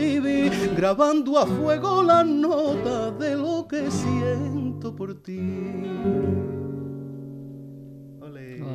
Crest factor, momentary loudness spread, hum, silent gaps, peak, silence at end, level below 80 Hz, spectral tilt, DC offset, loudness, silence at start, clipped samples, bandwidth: 18 dB; 20 LU; none; none; -6 dBFS; 0 s; -54 dBFS; -6.5 dB/octave; under 0.1%; -23 LUFS; 0 s; under 0.1%; 13.5 kHz